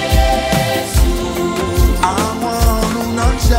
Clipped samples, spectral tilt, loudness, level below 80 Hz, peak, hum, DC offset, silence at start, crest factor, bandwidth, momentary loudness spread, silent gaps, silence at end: under 0.1%; -5 dB/octave; -16 LUFS; -18 dBFS; 0 dBFS; none; under 0.1%; 0 s; 14 dB; 16.5 kHz; 4 LU; none; 0 s